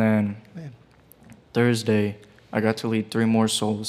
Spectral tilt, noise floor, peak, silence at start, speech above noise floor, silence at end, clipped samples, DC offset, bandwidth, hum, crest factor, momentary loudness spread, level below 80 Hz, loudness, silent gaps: -5.5 dB/octave; -53 dBFS; -6 dBFS; 0 s; 31 dB; 0 s; under 0.1%; under 0.1%; 15 kHz; none; 18 dB; 20 LU; -66 dBFS; -23 LUFS; none